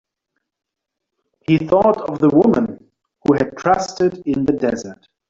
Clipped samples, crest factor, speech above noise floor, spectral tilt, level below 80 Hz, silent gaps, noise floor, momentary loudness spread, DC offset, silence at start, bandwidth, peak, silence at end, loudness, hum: under 0.1%; 16 dB; 64 dB; -7 dB/octave; -50 dBFS; none; -80 dBFS; 10 LU; under 0.1%; 1.5 s; 7.6 kHz; -2 dBFS; 0.35 s; -17 LUFS; none